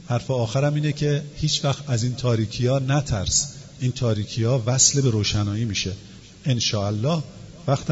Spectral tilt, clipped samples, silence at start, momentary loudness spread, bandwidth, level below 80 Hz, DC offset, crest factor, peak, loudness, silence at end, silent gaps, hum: -4.5 dB/octave; under 0.1%; 0 s; 8 LU; 8 kHz; -44 dBFS; under 0.1%; 20 dB; -2 dBFS; -22 LUFS; 0 s; none; none